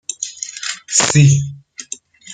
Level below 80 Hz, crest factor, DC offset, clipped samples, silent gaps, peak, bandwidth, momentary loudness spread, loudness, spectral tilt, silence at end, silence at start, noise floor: -50 dBFS; 16 dB; under 0.1%; under 0.1%; none; 0 dBFS; 9.6 kHz; 20 LU; -15 LUFS; -4 dB/octave; 0 s; 0.1 s; -35 dBFS